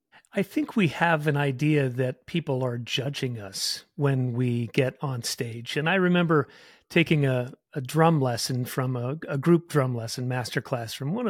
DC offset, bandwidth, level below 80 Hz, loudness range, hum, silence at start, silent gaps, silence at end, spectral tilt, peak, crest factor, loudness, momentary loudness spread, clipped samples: under 0.1%; 16.5 kHz; -66 dBFS; 3 LU; none; 0.35 s; none; 0 s; -5.5 dB/octave; -6 dBFS; 20 dB; -26 LUFS; 9 LU; under 0.1%